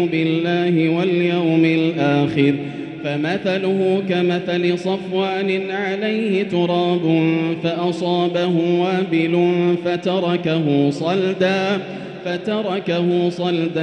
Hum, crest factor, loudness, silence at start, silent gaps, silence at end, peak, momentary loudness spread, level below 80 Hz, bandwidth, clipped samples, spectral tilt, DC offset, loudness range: none; 14 dB; -19 LUFS; 0 s; none; 0 s; -4 dBFS; 5 LU; -62 dBFS; 9 kHz; under 0.1%; -7.5 dB/octave; under 0.1%; 2 LU